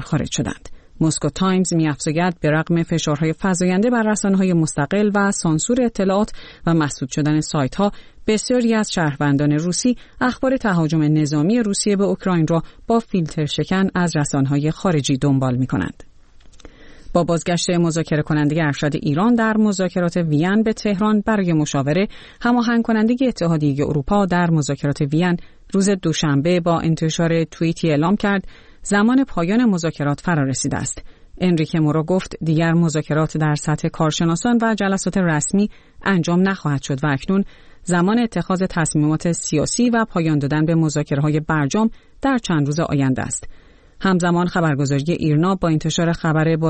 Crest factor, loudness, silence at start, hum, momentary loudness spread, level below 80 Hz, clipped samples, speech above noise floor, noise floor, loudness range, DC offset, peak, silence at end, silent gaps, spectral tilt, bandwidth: 14 dB; -19 LUFS; 0 s; none; 5 LU; -42 dBFS; under 0.1%; 26 dB; -44 dBFS; 2 LU; 0.2%; -4 dBFS; 0 s; none; -5.5 dB/octave; 8.8 kHz